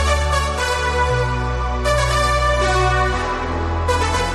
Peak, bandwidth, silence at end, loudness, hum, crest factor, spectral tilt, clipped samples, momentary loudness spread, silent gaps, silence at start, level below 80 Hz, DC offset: -4 dBFS; 13 kHz; 0 s; -18 LUFS; none; 14 dB; -4.5 dB/octave; under 0.1%; 5 LU; none; 0 s; -24 dBFS; under 0.1%